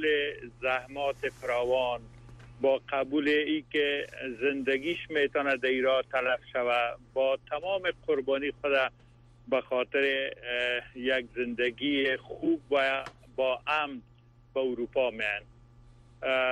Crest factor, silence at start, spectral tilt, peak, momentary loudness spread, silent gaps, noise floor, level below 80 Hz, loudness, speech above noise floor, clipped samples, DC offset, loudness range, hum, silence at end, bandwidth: 14 dB; 0 s; -5 dB/octave; -16 dBFS; 6 LU; none; -55 dBFS; -60 dBFS; -30 LUFS; 26 dB; under 0.1%; under 0.1%; 2 LU; none; 0 s; 11.5 kHz